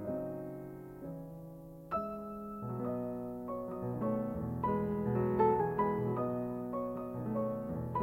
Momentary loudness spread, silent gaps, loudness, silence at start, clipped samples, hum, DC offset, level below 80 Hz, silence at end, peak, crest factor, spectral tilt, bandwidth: 15 LU; none; -36 LUFS; 0 s; under 0.1%; none; under 0.1%; -58 dBFS; 0 s; -16 dBFS; 20 dB; -10.5 dB/octave; 16 kHz